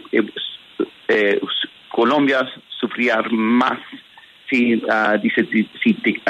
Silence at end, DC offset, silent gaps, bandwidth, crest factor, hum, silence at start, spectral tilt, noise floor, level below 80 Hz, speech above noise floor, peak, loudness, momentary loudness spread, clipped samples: 0 s; under 0.1%; none; 8 kHz; 14 dB; none; 0.1 s; -6 dB/octave; -46 dBFS; -68 dBFS; 28 dB; -4 dBFS; -19 LUFS; 10 LU; under 0.1%